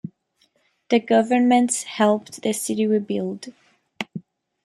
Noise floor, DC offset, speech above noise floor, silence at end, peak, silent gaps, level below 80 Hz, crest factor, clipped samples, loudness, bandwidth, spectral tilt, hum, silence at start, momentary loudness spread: -66 dBFS; under 0.1%; 45 dB; 0.45 s; -6 dBFS; none; -72 dBFS; 18 dB; under 0.1%; -21 LUFS; 15 kHz; -4.5 dB/octave; none; 0.05 s; 18 LU